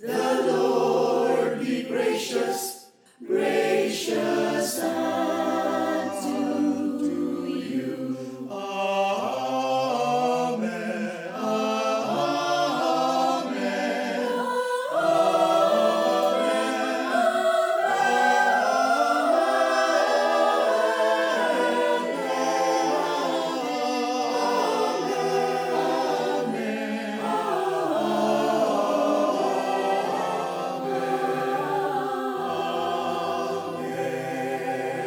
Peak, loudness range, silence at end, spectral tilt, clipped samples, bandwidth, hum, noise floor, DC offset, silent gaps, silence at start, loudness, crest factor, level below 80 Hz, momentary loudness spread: -10 dBFS; 5 LU; 0 s; -4 dB/octave; under 0.1%; 19 kHz; none; -47 dBFS; under 0.1%; none; 0 s; -24 LUFS; 14 dB; -78 dBFS; 7 LU